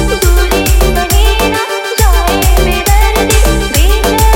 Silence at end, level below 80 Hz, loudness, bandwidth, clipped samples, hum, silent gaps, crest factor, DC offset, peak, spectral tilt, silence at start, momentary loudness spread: 0 s; -10 dBFS; -10 LUFS; 17.5 kHz; 0.7%; none; none; 8 dB; under 0.1%; 0 dBFS; -4 dB/octave; 0 s; 2 LU